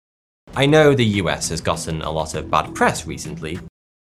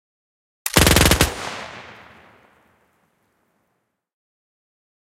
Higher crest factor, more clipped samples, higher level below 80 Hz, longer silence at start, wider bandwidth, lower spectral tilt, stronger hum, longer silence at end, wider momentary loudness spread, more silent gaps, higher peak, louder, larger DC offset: about the same, 20 dB vs 24 dB; neither; second, -44 dBFS vs -32 dBFS; second, 0.5 s vs 0.65 s; second, 13 kHz vs 17 kHz; first, -5 dB/octave vs -3 dB/octave; neither; second, 0.4 s vs 3.2 s; second, 16 LU vs 22 LU; neither; about the same, 0 dBFS vs 0 dBFS; about the same, -19 LUFS vs -17 LUFS; neither